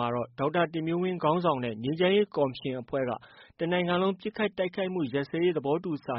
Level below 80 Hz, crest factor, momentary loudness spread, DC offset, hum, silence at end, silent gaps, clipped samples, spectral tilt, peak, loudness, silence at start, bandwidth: -66 dBFS; 18 dB; 6 LU; under 0.1%; none; 0 s; none; under 0.1%; -5 dB/octave; -12 dBFS; -29 LUFS; 0 s; 5.8 kHz